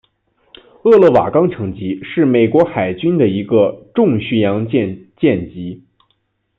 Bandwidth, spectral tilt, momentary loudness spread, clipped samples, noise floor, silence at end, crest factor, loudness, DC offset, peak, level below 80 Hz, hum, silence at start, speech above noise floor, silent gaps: 5.2 kHz; -9.5 dB/octave; 13 LU; under 0.1%; -65 dBFS; 0.8 s; 14 dB; -14 LUFS; under 0.1%; -2 dBFS; -52 dBFS; none; 0.85 s; 51 dB; none